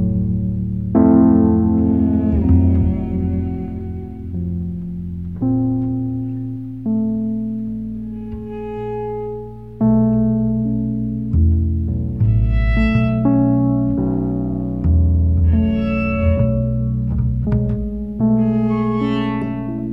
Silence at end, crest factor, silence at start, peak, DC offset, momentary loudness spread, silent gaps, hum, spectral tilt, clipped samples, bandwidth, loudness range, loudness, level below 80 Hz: 0 s; 16 dB; 0 s; -2 dBFS; 0.7%; 12 LU; none; none; -11 dB/octave; under 0.1%; 4.9 kHz; 8 LU; -18 LUFS; -26 dBFS